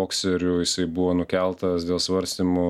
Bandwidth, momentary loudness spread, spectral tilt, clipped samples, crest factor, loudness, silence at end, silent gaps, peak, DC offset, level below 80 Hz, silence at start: 14 kHz; 2 LU; -4.5 dB/octave; under 0.1%; 14 dB; -24 LUFS; 0 s; none; -10 dBFS; under 0.1%; -50 dBFS; 0 s